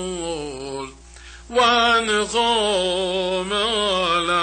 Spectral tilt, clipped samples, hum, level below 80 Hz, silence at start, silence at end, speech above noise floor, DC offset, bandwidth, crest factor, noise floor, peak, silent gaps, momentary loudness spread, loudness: -2.5 dB/octave; under 0.1%; none; -46 dBFS; 0 s; 0 s; 21 dB; under 0.1%; 9.8 kHz; 14 dB; -42 dBFS; -6 dBFS; none; 14 LU; -19 LUFS